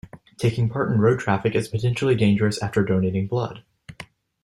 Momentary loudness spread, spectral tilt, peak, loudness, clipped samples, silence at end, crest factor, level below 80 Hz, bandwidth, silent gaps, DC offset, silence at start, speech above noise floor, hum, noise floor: 22 LU; -7 dB/octave; -6 dBFS; -22 LUFS; under 0.1%; 0.4 s; 16 dB; -52 dBFS; 12.5 kHz; none; under 0.1%; 0.15 s; 24 dB; none; -45 dBFS